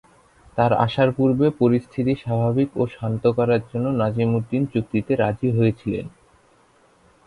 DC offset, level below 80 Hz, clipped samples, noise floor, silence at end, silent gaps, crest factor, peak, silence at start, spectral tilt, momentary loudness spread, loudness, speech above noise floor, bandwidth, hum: under 0.1%; -52 dBFS; under 0.1%; -57 dBFS; 1.15 s; none; 18 dB; -4 dBFS; 0.55 s; -9 dB/octave; 6 LU; -21 LUFS; 37 dB; 10.5 kHz; none